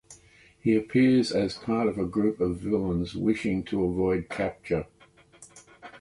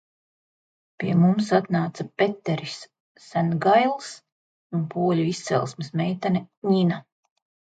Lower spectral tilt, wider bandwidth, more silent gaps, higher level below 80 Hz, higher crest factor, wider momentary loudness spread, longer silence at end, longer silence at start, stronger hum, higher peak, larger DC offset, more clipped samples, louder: about the same, -7 dB/octave vs -7 dB/octave; first, 11.5 kHz vs 9 kHz; second, none vs 3.00-3.15 s, 4.32-4.70 s, 6.57-6.62 s; first, -50 dBFS vs -68 dBFS; about the same, 16 dB vs 18 dB; second, 9 LU vs 12 LU; second, 0 s vs 0.8 s; second, 0.1 s vs 1 s; neither; second, -12 dBFS vs -6 dBFS; neither; neither; second, -27 LUFS vs -24 LUFS